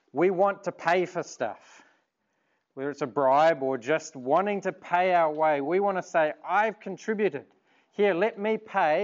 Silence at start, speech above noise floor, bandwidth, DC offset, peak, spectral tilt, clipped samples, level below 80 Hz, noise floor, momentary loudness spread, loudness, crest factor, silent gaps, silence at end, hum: 0.15 s; 49 dB; 7.6 kHz; under 0.1%; -10 dBFS; -5.5 dB/octave; under 0.1%; -86 dBFS; -75 dBFS; 11 LU; -26 LUFS; 16 dB; none; 0 s; none